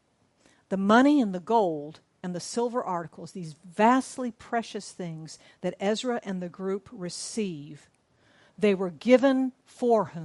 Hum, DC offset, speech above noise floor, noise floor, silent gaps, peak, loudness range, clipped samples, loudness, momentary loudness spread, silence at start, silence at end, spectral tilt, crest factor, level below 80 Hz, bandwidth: none; under 0.1%; 38 dB; -65 dBFS; none; -6 dBFS; 7 LU; under 0.1%; -27 LUFS; 19 LU; 0.7 s; 0 s; -5.5 dB/octave; 20 dB; -72 dBFS; 11.5 kHz